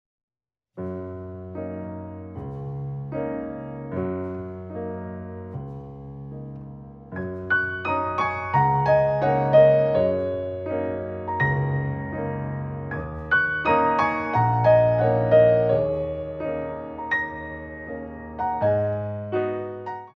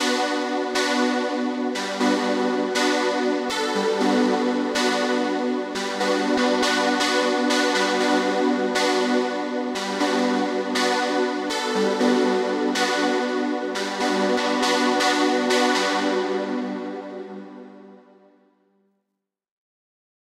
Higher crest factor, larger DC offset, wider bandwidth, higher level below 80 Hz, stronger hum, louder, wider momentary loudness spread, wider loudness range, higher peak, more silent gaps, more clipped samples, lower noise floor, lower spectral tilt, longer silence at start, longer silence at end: about the same, 18 dB vs 14 dB; neither; second, 6.2 kHz vs 15 kHz; first, -48 dBFS vs -70 dBFS; neither; about the same, -23 LUFS vs -22 LUFS; first, 18 LU vs 6 LU; first, 13 LU vs 4 LU; about the same, -6 dBFS vs -8 dBFS; neither; neither; second, -57 dBFS vs -82 dBFS; first, -9 dB/octave vs -3 dB/octave; first, 0.75 s vs 0 s; second, 0.05 s vs 2.45 s